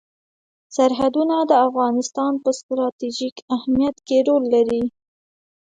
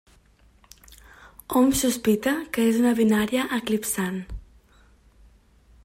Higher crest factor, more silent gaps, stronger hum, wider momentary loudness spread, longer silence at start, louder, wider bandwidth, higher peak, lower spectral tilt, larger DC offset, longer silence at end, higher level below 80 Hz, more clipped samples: about the same, 16 dB vs 16 dB; first, 2.63-2.69 s, 2.92-2.99 s, 3.32-3.36 s, 3.42-3.48 s vs none; neither; second, 9 LU vs 14 LU; second, 0.7 s vs 1.5 s; first, -20 LUFS vs -23 LUFS; second, 9.4 kHz vs 16.5 kHz; first, -4 dBFS vs -10 dBFS; about the same, -4.5 dB/octave vs -4.5 dB/octave; neither; second, 0.8 s vs 1.45 s; second, -58 dBFS vs -48 dBFS; neither